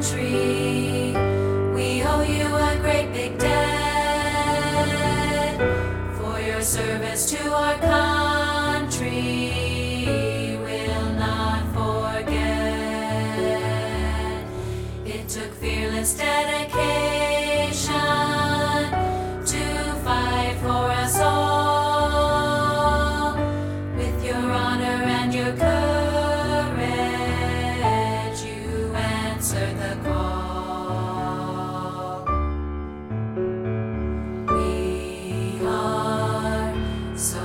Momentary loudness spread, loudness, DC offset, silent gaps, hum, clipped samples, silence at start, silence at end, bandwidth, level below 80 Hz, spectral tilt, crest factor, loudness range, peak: 8 LU; -23 LUFS; under 0.1%; none; none; under 0.1%; 0 s; 0 s; 17.5 kHz; -34 dBFS; -4.5 dB/octave; 18 dB; 5 LU; -6 dBFS